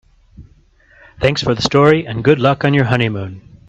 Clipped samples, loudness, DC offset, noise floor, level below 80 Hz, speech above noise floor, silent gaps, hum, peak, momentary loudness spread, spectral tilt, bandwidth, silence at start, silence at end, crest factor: under 0.1%; -14 LUFS; under 0.1%; -50 dBFS; -42 dBFS; 36 dB; none; none; 0 dBFS; 8 LU; -6 dB/octave; 8.2 kHz; 0.4 s; 0.15 s; 16 dB